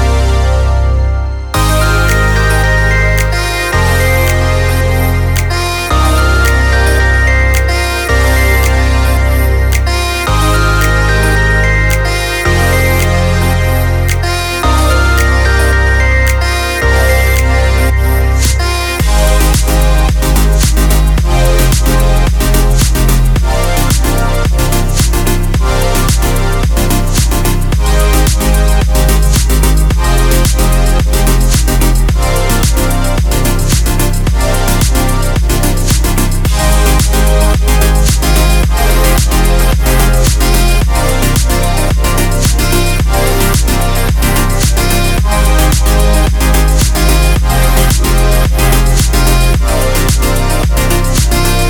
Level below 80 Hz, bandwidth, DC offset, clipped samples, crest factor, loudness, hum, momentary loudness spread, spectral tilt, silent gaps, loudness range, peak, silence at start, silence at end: -10 dBFS; 19.5 kHz; under 0.1%; under 0.1%; 8 dB; -11 LUFS; none; 3 LU; -4.5 dB/octave; none; 2 LU; 0 dBFS; 0 s; 0 s